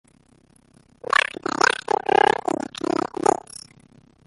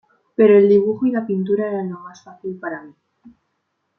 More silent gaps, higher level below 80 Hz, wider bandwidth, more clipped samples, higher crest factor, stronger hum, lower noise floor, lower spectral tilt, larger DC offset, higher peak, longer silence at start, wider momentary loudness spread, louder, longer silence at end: neither; about the same, -62 dBFS vs -66 dBFS; first, 11.5 kHz vs 6.4 kHz; neither; first, 22 dB vs 16 dB; neither; second, -57 dBFS vs -72 dBFS; second, -2.5 dB/octave vs -9 dB/octave; neither; about the same, -2 dBFS vs -2 dBFS; first, 1.2 s vs 0.4 s; second, 13 LU vs 20 LU; second, -22 LUFS vs -17 LUFS; first, 0.95 s vs 0.7 s